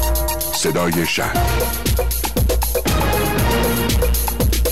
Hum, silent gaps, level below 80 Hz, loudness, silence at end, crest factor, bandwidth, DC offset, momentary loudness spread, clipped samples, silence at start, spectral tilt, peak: none; none; -22 dBFS; -18 LUFS; 0 s; 8 dB; 16 kHz; 3%; 2 LU; under 0.1%; 0 s; -4 dB/octave; -8 dBFS